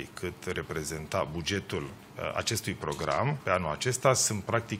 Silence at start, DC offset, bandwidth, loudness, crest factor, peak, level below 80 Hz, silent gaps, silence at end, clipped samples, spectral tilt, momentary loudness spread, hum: 0 s; under 0.1%; 16 kHz; -30 LUFS; 24 dB; -8 dBFS; -54 dBFS; none; 0 s; under 0.1%; -3.5 dB/octave; 11 LU; none